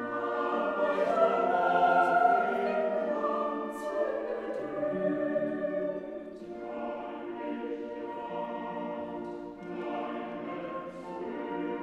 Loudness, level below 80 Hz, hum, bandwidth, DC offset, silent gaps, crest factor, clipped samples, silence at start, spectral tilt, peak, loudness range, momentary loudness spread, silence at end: -31 LUFS; -68 dBFS; none; 11.5 kHz; under 0.1%; none; 18 dB; under 0.1%; 0 s; -6.5 dB/octave; -14 dBFS; 11 LU; 14 LU; 0 s